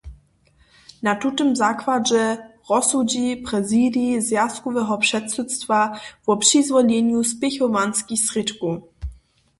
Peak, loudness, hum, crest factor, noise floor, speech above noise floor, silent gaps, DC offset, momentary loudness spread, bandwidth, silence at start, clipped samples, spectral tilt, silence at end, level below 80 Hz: -2 dBFS; -20 LUFS; none; 18 dB; -58 dBFS; 38 dB; none; under 0.1%; 9 LU; 12 kHz; 0.05 s; under 0.1%; -3 dB/octave; 0.45 s; -48 dBFS